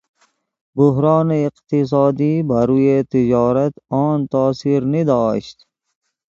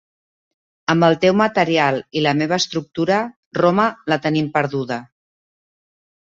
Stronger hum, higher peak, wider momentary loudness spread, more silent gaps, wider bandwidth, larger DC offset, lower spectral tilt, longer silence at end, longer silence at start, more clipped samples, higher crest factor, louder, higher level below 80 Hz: neither; about the same, 0 dBFS vs -2 dBFS; about the same, 6 LU vs 8 LU; second, none vs 3.36-3.51 s; about the same, 7.4 kHz vs 7.8 kHz; neither; first, -9 dB/octave vs -5.5 dB/octave; second, 0.9 s vs 1.3 s; second, 0.75 s vs 0.9 s; neither; about the same, 16 dB vs 18 dB; about the same, -17 LUFS vs -18 LUFS; first, -52 dBFS vs -58 dBFS